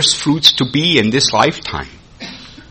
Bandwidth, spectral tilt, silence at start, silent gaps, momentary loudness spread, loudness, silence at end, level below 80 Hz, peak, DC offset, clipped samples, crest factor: over 20 kHz; -3 dB/octave; 0 s; none; 21 LU; -12 LUFS; 0.1 s; -42 dBFS; 0 dBFS; under 0.1%; 0.1%; 16 dB